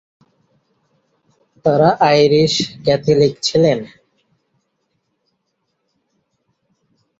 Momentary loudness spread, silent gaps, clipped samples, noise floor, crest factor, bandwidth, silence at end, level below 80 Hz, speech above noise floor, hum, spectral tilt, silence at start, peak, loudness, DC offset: 8 LU; none; under 0.1%; -71 dBFS; 18 dB; 8 kHz; 3.35 s; -54 dBFS; 57 dB; none; -5.5 dB/octave; 1.65 s; -2 dBFS; -14 LUFS; under 0.1%